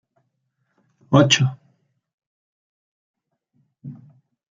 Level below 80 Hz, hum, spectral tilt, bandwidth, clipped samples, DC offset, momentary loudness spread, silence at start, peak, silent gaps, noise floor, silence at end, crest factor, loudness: -62 dBFS; none; -4.5 dB/octave; 7.8 kHz; under 0.1%; under 0.1%; 26 LU; 1.1 s; -2 dBFS; 2.14-2.18 s, 2.26-3.14 s; -73 dBFS; 0.6 s; 24 dB; -17 LUFS